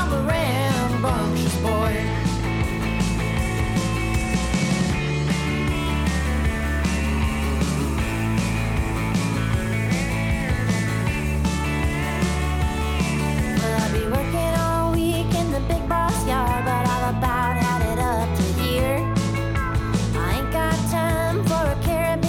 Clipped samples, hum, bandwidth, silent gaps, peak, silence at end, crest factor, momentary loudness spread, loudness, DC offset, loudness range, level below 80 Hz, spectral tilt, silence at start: under 0.1%; none; 17.5 kHz; none; -10 dBFS; 0 s; 12 dB; 2 LU; -22 LUFS; under 0.1%; 1 LU; -28 dBFS; -5.5 dB/octave; 0 s